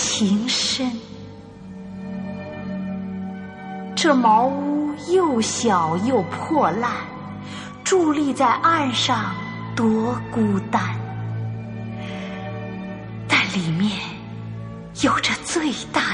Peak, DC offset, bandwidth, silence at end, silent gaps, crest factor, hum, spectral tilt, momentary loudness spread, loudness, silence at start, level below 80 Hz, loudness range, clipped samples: -4 dBFS; under 0.1%; 10 kHz; 0 s; none; 18 dB; none; -4 dB/octave; 15 LU; -21 LUFS; 0 s; -54 dBFS; 6 LU; under 0.1%